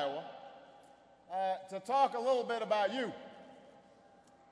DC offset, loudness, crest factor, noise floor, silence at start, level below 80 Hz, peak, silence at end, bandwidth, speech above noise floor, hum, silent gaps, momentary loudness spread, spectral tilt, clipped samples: under 0.1%; -35 LUFS; 18 dB; -62 dBFS; 0 s; -84 dBFS; -18 dBFS; 0.75 s; 11 kHz; 29 dB; none; none; 23 LU; -4 dB/octave; under 0.1%